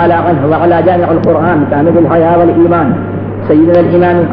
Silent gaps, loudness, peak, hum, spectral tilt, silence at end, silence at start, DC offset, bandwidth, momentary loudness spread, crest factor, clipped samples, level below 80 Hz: none; -9 LUFS; 0 dBFS; none; -11.5 dB/octave; 0 s; 0 s; under 0.1%; 5 kHz; 4 LU; 8 dB; under 0.1%; -40 dBFS